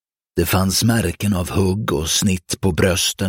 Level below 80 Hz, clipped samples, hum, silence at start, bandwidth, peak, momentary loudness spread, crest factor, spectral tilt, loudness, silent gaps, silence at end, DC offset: -38 dBFS; under 0.1%; none; 0.35 s; 17 kHz; -2 dBFS; 5 LU; 16 dB; -4 dB/octave; -18 LUFS; none; 0 s; under 0.1%